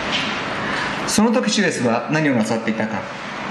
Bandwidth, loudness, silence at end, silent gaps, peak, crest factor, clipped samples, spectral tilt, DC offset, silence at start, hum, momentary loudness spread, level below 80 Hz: 14 kHz; -20 LUFS; 0 s; none; -4 dBFS; 16 dB; under 0.1%; -4 dB/octave; under 0.1%; 0 s; none; 8 LU; -52 dBFS